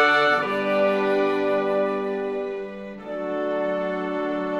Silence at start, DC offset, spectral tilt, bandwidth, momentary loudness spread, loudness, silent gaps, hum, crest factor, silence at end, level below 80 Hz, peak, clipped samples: 0 s; under 0.1%; -5.5 dB/octave; 12 kHz; 11 LU; -23 LUFS; none; none; 16 dB; 0 s; -60 dBFS; -8 dBFS; under 0.1%